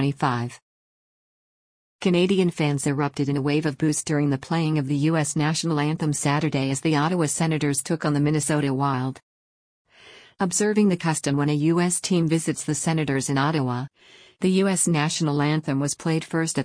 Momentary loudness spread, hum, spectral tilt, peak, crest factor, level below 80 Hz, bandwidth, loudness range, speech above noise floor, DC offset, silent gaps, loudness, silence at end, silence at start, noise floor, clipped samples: 5 LU; none; -5 dB/octave; -8 dBFS; 16 dB; -60 dBFS; 10.5 kHz; 2 LU; 27 dB; under 0.1%; 0.62-1.99 s, 9.23-9.85 s; -23 LUFS; 0 s; 0 s; -50 dBFS; under 0.1%